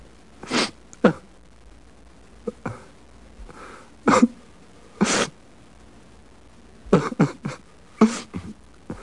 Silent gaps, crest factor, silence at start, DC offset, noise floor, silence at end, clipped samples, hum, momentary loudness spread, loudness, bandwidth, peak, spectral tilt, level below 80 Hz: none; 22 dB; 0.45 s; 0.3%; -50 dBFS; 0 s; under 0.1%; none; 23 LU; -23 LUFS; 11.5 kHz; -4 dBFS; -5 dB/octave; -52 dBFS